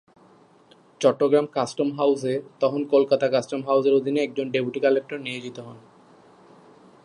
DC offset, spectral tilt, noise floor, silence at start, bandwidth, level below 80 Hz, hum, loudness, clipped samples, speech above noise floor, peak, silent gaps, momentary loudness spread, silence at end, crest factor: under 0.1%; -5.5 dB/octave; -55 dBFS; 1 s; 10.5 kHz; -76 dBFS; none; -23 LUFS; under 0.1%; 33 dB; -6 dBFS; none; 12 LU; 1.25 s; 20 dB